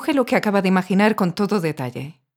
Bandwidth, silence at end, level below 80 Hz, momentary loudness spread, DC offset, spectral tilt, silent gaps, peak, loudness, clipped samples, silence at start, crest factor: 16.5 kHz; 0.25 s; -64 dBFS; 12 LU; under 0.1%; -6.5 dB/octave; none; -2 dBFS; -20 LUFS; under 0.1%; 0 s; 16 dB